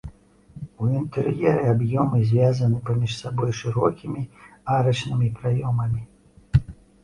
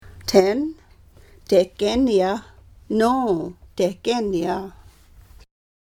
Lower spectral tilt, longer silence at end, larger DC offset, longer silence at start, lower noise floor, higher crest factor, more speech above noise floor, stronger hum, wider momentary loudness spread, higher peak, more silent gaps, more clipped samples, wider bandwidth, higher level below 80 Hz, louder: first, -7.5 dB/octave vs -5.5 dB/octave; second, 0.3 s vs 1.3 s; neither; about the same, 0.05 s vs 0.05 s; about the same, -47 dBFS vs -49 dBFS; about the same, 18 dB vs 22 dB; second, 25 dB vs 30 dB; neither; about the same, 12 LU vs 12 LU; about the same, -4 dBFS vs -2 dBFS; neither; neither; second, 10.5 kHz vs 19 kHz; first, -42 dBFS vs -48 dBFS; about the same, -23 LUFS vs -21 LUFS